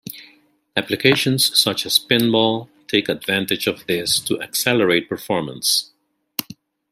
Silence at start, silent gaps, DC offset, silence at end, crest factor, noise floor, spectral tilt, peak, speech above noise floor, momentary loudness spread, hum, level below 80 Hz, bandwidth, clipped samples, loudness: 0.05 s; none; under 0.1%; 0.4 s; 20 dB; -55 dBFS; -3 dB/octave; 0 dBFS; 36 dB; 12 LU; none; -60 dBFS; 16 kHz; under 0.1%; -18 LUFS